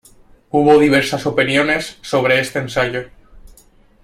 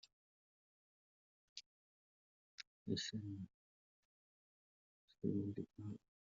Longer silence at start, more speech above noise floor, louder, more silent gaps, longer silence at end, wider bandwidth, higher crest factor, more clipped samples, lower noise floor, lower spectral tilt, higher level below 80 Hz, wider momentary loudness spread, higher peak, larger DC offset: second, 0.55 s vs 1.55 s; second, 34 dB vs over 45 dB; first, -15 LUFS vs -47 LUFS; second, none vs 1.66-2.58 s, 2.67-2.86 s, 3.54-5.08 s; first, 0.55 s vs 0.4 s; first, 15.5 kHz vs 7.4 kHz; second, 16 dB vs 24 dB; neither; second, -49 dBFS vs under -90 dBFS; about the same, -5 dB/octave vs -6 dB/octave; first, -46 dBFS vs -84 dBFS; second, 9 LU vs 15 LU; first, 0 dBFS vs -28 dBFS; neither